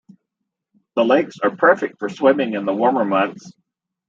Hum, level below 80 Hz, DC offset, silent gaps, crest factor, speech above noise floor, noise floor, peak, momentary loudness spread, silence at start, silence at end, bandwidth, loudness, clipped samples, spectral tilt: none; -72 dBFS; under 0.1%; none; 18 dB; 62 dB; -80 dBFS; -2 dBFS; 7 LU; 0.95 s; 0.55 s; 7.6 kHz; -18 LUFS; under 0.1%; -6 dB/octave